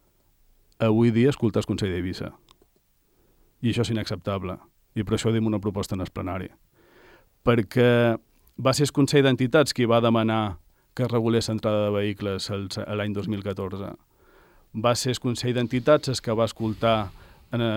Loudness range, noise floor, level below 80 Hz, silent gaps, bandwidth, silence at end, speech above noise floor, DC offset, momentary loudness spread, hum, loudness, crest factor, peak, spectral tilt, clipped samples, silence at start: 7 LU; -65 dBFS; -54 dBFS; none; 16.5 kHz; 0 s; 42 dB; under 0.1%; 13 LU; none; -24 LUFS; 18 dB; -8 dBFS; -6 dB/octave; under 0.1%; 0.8 s